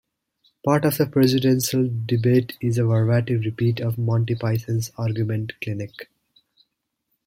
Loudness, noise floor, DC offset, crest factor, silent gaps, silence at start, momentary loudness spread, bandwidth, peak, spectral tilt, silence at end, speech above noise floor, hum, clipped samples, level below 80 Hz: -22 LUFS; -76 dBFS; under 0.1%; 18 dB; none; 0.65 s; 10 LU; 16.5 kHz; -4 dBFS; -6.5 dB/octave; 1.25 s; 55 dB; none; under 0.1%; -58 dBFS